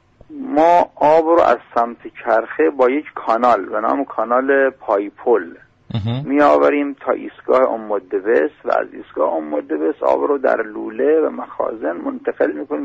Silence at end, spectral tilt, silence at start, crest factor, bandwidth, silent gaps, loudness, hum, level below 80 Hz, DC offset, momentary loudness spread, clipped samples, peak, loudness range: 0 s; -7.5 dB/octave; 0.3 s; 14 dB; 7.8 kHz; none; -17 LUFS; none; -56 dBFS; under 0.1%; 10 LU; under 0.1%; -4 dBFS; 3 LU